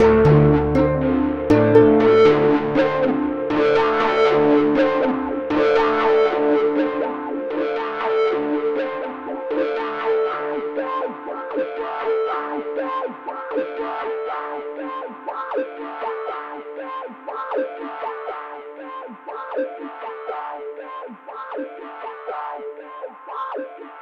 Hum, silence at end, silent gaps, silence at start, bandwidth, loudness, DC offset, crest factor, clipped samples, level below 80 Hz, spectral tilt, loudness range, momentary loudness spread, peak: none; 0 s; none; 0 s; 6.6 kHz; -20 LUFS; under 0.1%; 20 dB; under 0.1%; -44 dBFS; -8 dB/octave; 15 LU; 18 LU; 0 dBFS